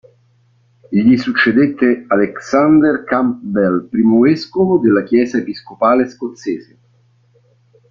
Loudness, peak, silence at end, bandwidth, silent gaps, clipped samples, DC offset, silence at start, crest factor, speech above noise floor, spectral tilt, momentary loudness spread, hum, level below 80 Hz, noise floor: -14 LUFS; -2 dBFS; 1.3 s; 7.2 kHz; none; under 0.1%; under 0.1%; 0.9 s; 14 dB; 41 dB; -7 dB/octave; 10 LU; none; -54 dBFS; -55 dBFS